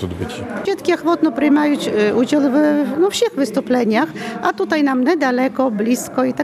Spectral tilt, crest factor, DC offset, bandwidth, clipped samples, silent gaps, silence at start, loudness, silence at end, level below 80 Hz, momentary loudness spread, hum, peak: -5 dB/octave; 12 dB; under 0.1%; 14.5 kHz; under 0.1%; none; 0 s; -17 LUFS; 0 s; -56 dBFS; 7 LU; none; -4 dBFS